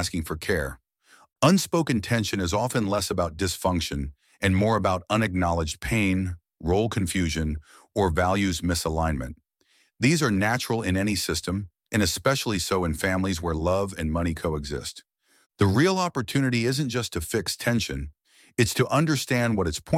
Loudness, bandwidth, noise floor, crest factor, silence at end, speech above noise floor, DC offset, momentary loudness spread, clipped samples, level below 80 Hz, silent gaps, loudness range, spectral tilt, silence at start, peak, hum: -25 LUFS; 16.5 kHz; -66 dBFS; 20 dB; 0 s; 41 dB; under 0.1%; 9 LU; under 0.1%; -42 dBFS; 15.46-15.50 s; 1 LU; -5 dB/octave; 0 s; -6 dBFS; none